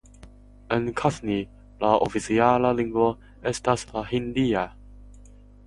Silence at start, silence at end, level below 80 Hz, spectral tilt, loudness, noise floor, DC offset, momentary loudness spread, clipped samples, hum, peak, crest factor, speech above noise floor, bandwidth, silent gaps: 0.25 s; 0.4 s; -48 dBFS; -6 dB/octave; -25 LUFS; -48 dBFS; under 0.1%; 9 LU; under 0.1%; 50 Hz at -45 dBFS; -4 dBFS; 22 dB; 25 dB; 11.5 kHz; none